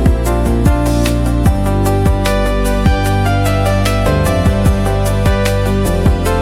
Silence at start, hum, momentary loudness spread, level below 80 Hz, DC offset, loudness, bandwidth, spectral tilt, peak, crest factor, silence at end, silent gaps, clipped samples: 0 s; none; 2 LU; -16 dBFS; under 0.1%; -14 LUFS; 16 kHz; -6.5 dB/octave; 0 dBFS; 10 dB; 0 s; none; under 0.1%